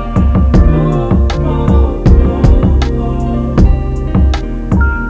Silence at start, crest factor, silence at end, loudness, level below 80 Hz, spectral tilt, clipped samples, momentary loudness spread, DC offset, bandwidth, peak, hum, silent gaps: 0 s; 10 dB; 0 s; -12 LUFS; -12 dBFS; -8.5 dB/octave; 0.6%; 6 LU; 0.4%; 7.8 kHz; 0 dBFS; none; none